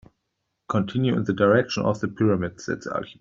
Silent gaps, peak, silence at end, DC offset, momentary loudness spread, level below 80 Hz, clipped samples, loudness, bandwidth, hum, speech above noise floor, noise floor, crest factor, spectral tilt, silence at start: none; -6 dBFS; 0.1 s; under 0.1%; 10 LU; -58 dBFS; under 0.1%; -24 LUFS; 7.6 kHz; none; 55 dB; -78 dBFS; 18 dB; -6.5 dB/octave; 0.7 s